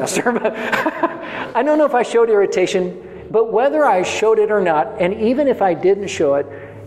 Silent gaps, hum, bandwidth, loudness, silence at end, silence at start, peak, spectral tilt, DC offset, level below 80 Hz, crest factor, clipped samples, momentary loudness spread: none; none; 14 kHz; -17 LUFS; 0 s; 0 s; -2 dBFS; -4.5 dB/octave; under 0.1%; -54 dBFS; 14 dB; under 0.1%; 7 LU